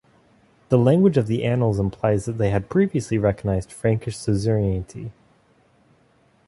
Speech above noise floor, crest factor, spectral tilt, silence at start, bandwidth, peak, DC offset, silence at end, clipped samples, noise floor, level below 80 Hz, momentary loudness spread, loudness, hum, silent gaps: 39 dB; 18 dB; -8 dB/octave; 0.7 s; 11.5 kHz; -4 dBFS; under 0.1%; 1.35 s; under 0.1%; -59 dBFS; -42 dBFS; 8 LU; -21 LUFS; none; none